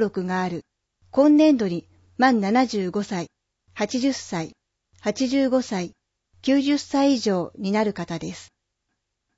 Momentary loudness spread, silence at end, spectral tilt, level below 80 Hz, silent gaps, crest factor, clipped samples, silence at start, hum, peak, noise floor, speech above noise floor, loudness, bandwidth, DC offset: 16 LU; 0.95 s; -5.5 dB/octave; -64 dBFS; none; 16 dB; under 0.1%; 0 s; none; -6 dBFS; -78 dBFS; 56 dB; -23 LUFS; 8 kHz; under 0.1%